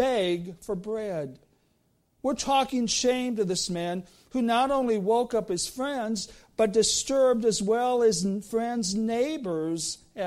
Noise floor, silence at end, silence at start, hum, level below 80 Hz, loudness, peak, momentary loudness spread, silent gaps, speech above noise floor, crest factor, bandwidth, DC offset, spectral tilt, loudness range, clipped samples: -69 dBFS; 0 s; 0 s; none; -58 dBFS; -27 LUFS; -12 dBFS; 10 LU; none; 43 dB; 16 dB; 15.5 kHz; under 0.1%; -3.5 dB/octave; 3 LU; under 0.1%